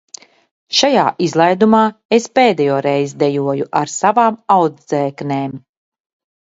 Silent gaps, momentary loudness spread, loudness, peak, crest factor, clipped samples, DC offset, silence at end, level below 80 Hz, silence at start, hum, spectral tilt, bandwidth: 2.05-2.09 s; 8 LU; -15 LUFS; 0 dBFS; 16 dB; under 0.1%; under 0.1%; 0.9 s; -62 dBFS; 0.7 s; none; -4.5 dB/octave; 8 kHz